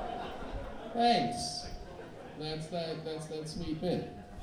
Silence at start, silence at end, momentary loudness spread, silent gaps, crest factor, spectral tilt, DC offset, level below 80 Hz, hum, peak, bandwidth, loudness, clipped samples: 0 s; 0 s; 17 LU; none; 20 dB; -5 dB/octave; under 0.1%; -52 dBFS; none; -16 dBFS; 14 kHz; -35 LUFS; under 0.1%